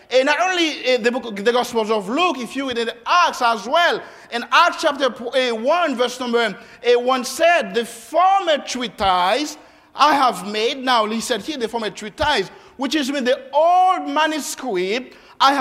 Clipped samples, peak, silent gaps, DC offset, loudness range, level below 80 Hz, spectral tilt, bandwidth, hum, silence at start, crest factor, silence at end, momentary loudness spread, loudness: under 0.1%; -2 dBFS; none; under 0.1%; 2 LU; -54 dBFS; -2.5 dB/octave; 16 kHz; none; 0.1 s; 18 dB; 0 s; 9 LU; -19 LUFS